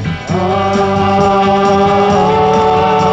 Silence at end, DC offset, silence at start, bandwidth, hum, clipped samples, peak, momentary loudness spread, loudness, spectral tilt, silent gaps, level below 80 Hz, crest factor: 0 s; under 0.1%; 0 s; 8.4 kHz; none; under 0.1%; 0 dBFS; 4 LU; -11 LUFS; -6.5 dB/octave; none; -36 dBFS; 10 dB